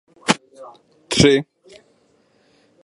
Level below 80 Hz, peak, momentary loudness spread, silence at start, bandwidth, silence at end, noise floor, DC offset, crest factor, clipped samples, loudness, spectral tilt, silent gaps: -46 dBFS; 0 dBFS; 9 LU; 0.25 s; 11.5 kHz; 1.4 s; -59 dBFS; under 0.1%; 22 dB; under 0.1%; -18 LUFS; -4 dB/octave; none